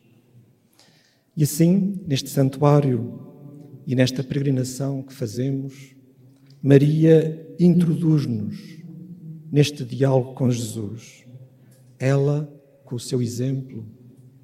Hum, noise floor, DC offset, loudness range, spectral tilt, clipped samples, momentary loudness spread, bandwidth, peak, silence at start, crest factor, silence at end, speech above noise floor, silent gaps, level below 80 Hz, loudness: none; -59 dBFS; under 0.1%; 6 LU; -7 dB/octave; under 0.1%; 22 LU; 16 kHz; 0 dBFS; 1.35 s; 22 dB; 0.5 s; 39 dB; none; -64 dBFS; -21 LUFS